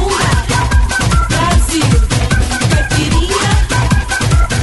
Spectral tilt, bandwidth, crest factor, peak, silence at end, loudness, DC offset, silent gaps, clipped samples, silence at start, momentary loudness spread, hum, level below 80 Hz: -4.5 dB/octave; 12 kHz; 10 dB; 0 dBFS; 0 s; -13 LUFS; under 0.1%; none; under 0.1%; 0 s; 1 LU; none; -16 dBFS